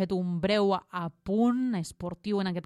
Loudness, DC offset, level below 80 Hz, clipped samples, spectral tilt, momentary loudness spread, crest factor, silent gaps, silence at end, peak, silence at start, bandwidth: -29 LUFS; under 0.1%; -58 dBFS; under 0.1%; -6.5 dB/octave; 11 LU; 14 dB; none; 0.05 s; -14 dBFS; 0 s; 12.5 kHz